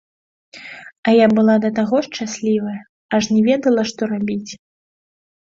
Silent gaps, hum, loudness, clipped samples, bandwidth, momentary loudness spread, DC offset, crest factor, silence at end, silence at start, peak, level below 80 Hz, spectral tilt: 0.98-1.03 s, 2.89-3.09 s; none; -17 LUFS; under 0.1%; 7.6 kHz; 22 LU; under 0.1%; 16 dB; 0.85 s; 0.55 s; -2 dBFS; -58 dBFS; -5.5 dB/octave